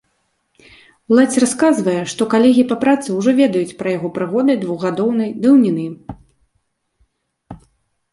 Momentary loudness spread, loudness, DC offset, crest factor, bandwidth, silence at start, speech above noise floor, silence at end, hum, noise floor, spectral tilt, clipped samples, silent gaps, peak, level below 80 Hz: 9 LU; -15 LUFS; under 0.1%; 16 dB; 11.5 kHz; 1.1 s; 53 dB; 0.55 s; none; -68 dBFS; -5.5 dB/octave; under 0.1%; none; -2 dBFS; -56 dBFS